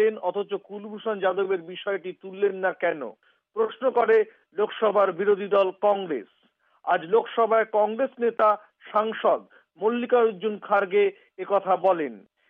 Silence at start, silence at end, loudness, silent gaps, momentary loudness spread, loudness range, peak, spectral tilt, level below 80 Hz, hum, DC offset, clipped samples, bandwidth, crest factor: 0 s; 0.3 s; -25 LUFS; none; 11 LU; 3 LU; -10 dBFS; -3 dB/octave; -82 dBFS; none; under 0.1%; under 0.1%; 4 kHz; 14 dB